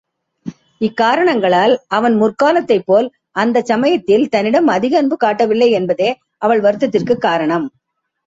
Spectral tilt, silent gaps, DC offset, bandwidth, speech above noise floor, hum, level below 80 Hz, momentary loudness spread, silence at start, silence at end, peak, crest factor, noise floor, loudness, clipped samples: -6 dB/octave; none; under 0.1%; 8 kHz; 56 dB; none; -60 dBFS; 8 LU; 0.45 s; 0.6 s; -2 dBFS; 14 dB; -70 dBFS; -14 LUFS; under 0.1%